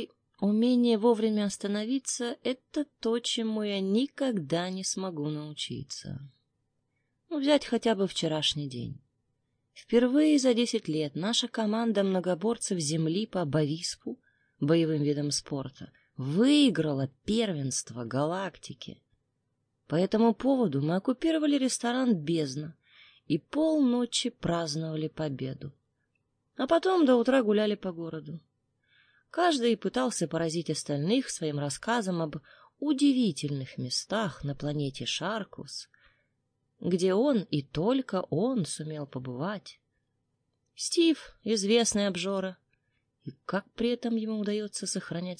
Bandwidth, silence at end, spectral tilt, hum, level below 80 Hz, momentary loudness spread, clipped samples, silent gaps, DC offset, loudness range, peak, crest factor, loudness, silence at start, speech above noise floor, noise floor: 10.5 kHz; 0.05 s; -5 dB/octave; none; -64 dBFS; 14 LU; under 0.1%; none; under 0.1%; 5 LU; -10 dBFS; 20 dB; -29 LUFS; 0 s; 50 dB; -78 dBFS